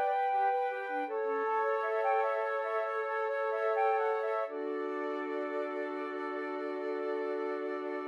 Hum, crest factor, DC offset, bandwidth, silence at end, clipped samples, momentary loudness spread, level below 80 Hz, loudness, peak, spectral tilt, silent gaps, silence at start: none; 14 dB; under 0.1%; 7.4 kHz; 0 s; under 0.1%; 7 LU; under -90 dBFS; -33 LUFS; -18 dBFS; -3.5 dB/octave; none; 0 s